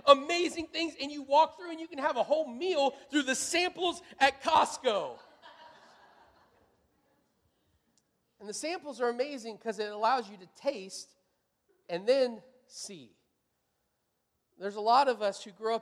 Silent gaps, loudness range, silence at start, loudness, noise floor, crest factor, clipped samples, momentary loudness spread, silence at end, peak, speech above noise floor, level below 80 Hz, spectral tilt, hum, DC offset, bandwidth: none; 10 LU; 0.05 s; -30 LUFS; -80 dBFS; 26 dB; under 0.1%; 18 LU; 0 s; -6 dBFS; 49 dB; -74 dBFS; -2 dB/octave; none; under 0.1%; 14.5 kHz